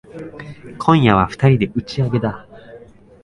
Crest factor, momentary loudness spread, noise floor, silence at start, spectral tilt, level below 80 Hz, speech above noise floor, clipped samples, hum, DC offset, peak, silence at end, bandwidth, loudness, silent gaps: 18 dB; 22 LU; -42 dBFS; 0.15 s; -8 dB/octave; -42 dBFS; 26 dB; under 0.1%; none; under 0.1%; 0 dBFS; 0.45 s; 10.5 kHz; -16 LUFS; none